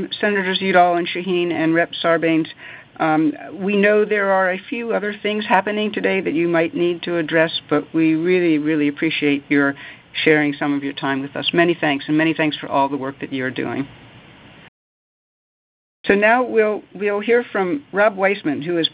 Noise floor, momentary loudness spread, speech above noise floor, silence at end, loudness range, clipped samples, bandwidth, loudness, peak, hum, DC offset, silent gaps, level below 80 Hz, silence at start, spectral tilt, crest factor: -44 dBFS; 8 LU; 25 dB; 0.05 s; 4 LU; under 0.1%; 4 kHz; -18 LUFS; 0 dBFS; none; under 0.1%; 14.68-16.04 s; -62 dBFS; 0 s; -9.5 dB/octave; 18 dB